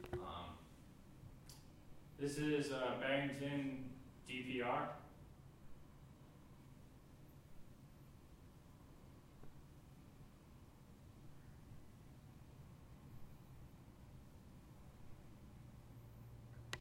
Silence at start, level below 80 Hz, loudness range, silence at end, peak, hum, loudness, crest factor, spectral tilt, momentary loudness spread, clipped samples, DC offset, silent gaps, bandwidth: 0 s; -66 dBFS; 20 LU; 0 s; -24 dBFS; none; -44 LUFS; 24 dB; -5.5 dB/octave; 22 LU; under 0.1%; under 0.1%; none; 16 kHz